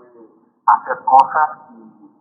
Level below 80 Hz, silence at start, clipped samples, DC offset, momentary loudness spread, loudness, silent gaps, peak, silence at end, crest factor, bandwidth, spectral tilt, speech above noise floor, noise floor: -78 dBFS; 0.65 s; under 0.1%; under 0.1%; 8 LU; -15 LUFS; none; 0 dBFS; 0.65 s; 18 dB; 8.4 kHz; -4.5 dB/octave; 33 dB; -48 dBFS